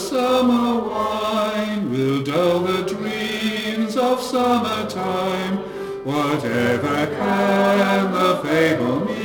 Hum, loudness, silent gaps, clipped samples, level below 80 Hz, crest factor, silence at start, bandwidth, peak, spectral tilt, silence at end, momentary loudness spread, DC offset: none; -20 LUFS; none; under 0.1%; -54 dBFS; 16 dB; 0 s; 19 kHz; -4 dBFS; -5.5 dB/octave; 0 s; 7 LU; under 0.1%